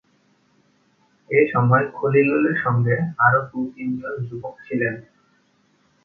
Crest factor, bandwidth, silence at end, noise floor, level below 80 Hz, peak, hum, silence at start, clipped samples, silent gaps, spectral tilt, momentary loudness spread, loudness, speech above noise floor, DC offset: 20 dB; 4.4 kHz; 1.05 s; -62 dBFS; -60 dBFS; -2 dBFS; none; 1.3 s; under 0.1%; none; -10.5 dB/octave; 12 LU; -20 LUFS; 42 dB; under 0.1%